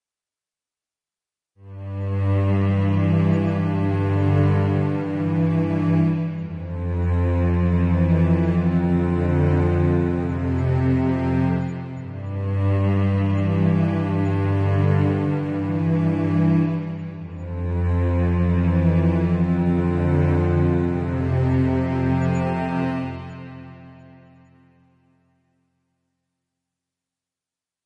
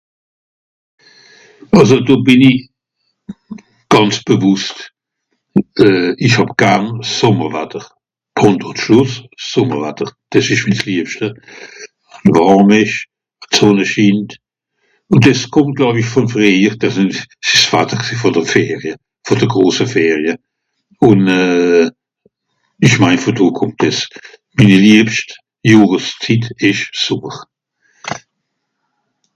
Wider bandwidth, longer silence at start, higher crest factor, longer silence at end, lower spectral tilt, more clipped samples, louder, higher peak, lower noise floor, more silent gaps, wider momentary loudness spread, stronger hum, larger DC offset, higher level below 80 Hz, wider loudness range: second, 5 kHz vs 10 kHz; about the same, 1.65 s vs 1.7 s; about the same, 14 dB vs 14 dB; first, 3.9 s vs 1.15 s; first, -10 dB/octave vs -5.5 dB/octave; second, under 0.1% vs 0.6%; second, -21 LUFS vs -12 LUFS; second, -8 dBFS vs 0 dBFS; first, under -90 dBFS vs -72 dBFS; neither; second, 10 LU vs 16 LU; neither; neither; first, -44 dBFS vs -50 dBFS; about the same, 4 LU vs 4 LU